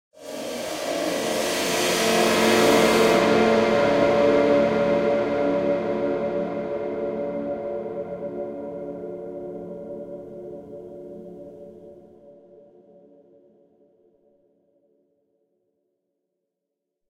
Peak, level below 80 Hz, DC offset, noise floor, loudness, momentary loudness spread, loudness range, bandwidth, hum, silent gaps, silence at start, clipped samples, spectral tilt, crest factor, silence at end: -4 dBFS; -56 dBFS; under 0.1%; -82 dBFS; -22 LUFS; 21 LU; 21 LU; 16 kHz; none; none; 0.2 s; under 0.1%; -4 dB/octave; 20 dB; 4.8 s